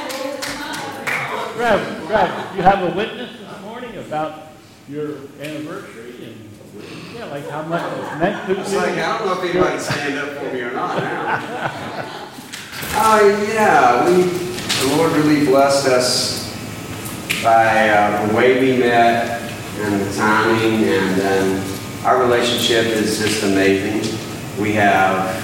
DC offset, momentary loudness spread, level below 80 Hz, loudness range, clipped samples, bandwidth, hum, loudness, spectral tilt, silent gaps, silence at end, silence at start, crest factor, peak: under 0.1%; 17 LU; -48 dBFS; 13 LU; under 0.1%; 16.5 kHz; none; -17 LUFS; -4 dB/octave; none; 0 s; 0 s; 18 dB; 0 dBFS